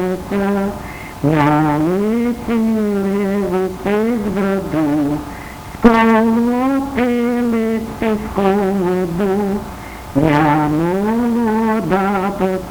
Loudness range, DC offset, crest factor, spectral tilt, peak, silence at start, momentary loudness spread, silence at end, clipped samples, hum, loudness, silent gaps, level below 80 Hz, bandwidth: 2 LU; under 0.1%; 16 dB; -7.5 dB/octave; 0 dBFS; 0 s; 7 LU; 0 s; under 0.1%; none; -16 LUFS; none; -38 dBFS; over 20 kHz